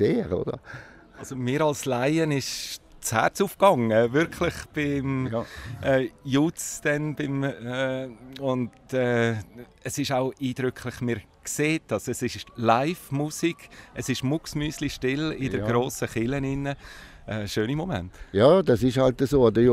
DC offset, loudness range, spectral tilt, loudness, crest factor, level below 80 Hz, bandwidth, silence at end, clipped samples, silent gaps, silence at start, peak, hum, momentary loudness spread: under 0.1%; 4 LU; -5.5 dB/octave; -26 LUFS; 20 dB; -50 dBFS; 16 kHz; 0 s; under 0.1%; none; 0 s; -4 dBFS; none; 13 LU